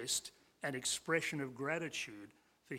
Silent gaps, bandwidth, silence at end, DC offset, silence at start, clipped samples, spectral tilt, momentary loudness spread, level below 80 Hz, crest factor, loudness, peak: none; 16.5 kHz; 0 s; under 0.1%; 0 s; under 0.1%; -2.5 dB/octave; 17 LU; -78 dBFS; 20 dB; -39 LUFS; -22 dBFS